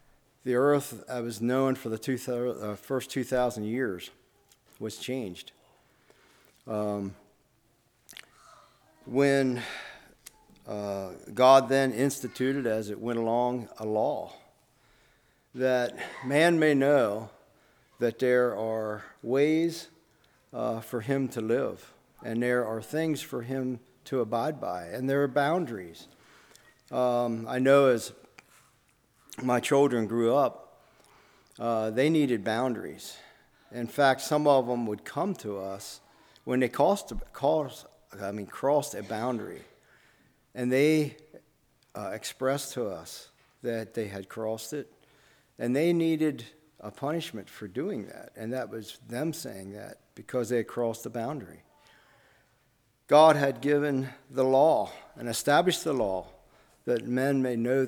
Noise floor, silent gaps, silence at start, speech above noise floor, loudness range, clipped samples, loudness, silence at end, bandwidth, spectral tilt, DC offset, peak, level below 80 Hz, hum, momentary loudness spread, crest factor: -69 dBFS; none; 0.45 s; 41 dB; 9 LU; under 0.1%; -28 LUFS; 0 s; 20 kHz; -5.5 dB/octave; under 0.1%; -6 dBFS; -60 dBFS; none; 18 LU; 22 dB